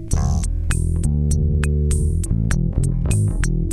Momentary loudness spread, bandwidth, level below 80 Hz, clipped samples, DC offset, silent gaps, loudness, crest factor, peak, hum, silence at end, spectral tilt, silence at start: 3 LU; 12.5 kHz; -20 dBFS; under 0.1%; 0.4%; none; -20 LUFS; 14 dB; -4 dBFS; none; 0 s; -6.5 dB/octave; 0 s